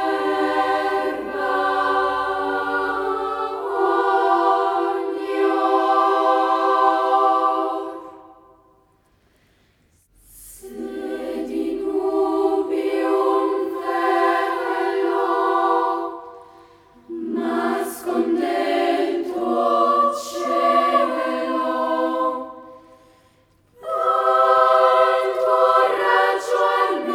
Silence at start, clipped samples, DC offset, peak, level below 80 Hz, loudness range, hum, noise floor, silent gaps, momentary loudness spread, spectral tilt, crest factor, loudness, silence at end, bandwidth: 0 s; under 0.1%; under 0.1%; -4 dBFS; -62 dBFS; 7 LU; none; -60 dBFS; none; 9 LU; -3.5 dB/octave; 18 dB; -20 LUFS; 0 s; 16.5 kHz